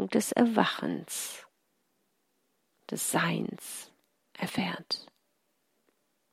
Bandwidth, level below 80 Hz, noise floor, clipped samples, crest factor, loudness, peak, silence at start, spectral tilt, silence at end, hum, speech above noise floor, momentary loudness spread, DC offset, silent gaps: 16 kHz; -78 dBFS; -76 dBFS; under 0.1%; 26 dB; -31 LUFS; -8 dBFS; 0 s; -4 dB/octave; 1.3 s; none; 46 dB; 15 LU; under 0.1%; none